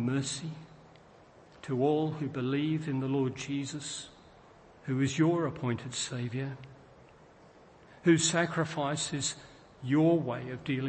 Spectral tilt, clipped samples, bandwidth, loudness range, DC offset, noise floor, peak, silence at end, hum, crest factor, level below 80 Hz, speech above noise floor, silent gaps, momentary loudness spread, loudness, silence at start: -5 dB/octave; under 0.1%; 8.8 kHz; 4 LU; under 0.1%; -57 dBFS; -14 dBFS; 0 s; none; 20 dB; -66 dBFS; 26 dB; none; 17 LU; -31 LUFS; 0 s